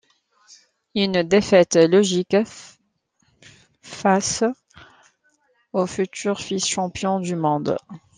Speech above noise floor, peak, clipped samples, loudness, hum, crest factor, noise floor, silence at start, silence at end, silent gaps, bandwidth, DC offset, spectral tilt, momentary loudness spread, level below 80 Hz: 48 dB; -2 dBFS; under 0.1%; -20 LUFS; none; 20 dB; -68 dBFS; 0.95 s; 0.2 s; none; 10 kHz; under 0.1%; -4.5 dB/octave; 13 LU; -58 dBFS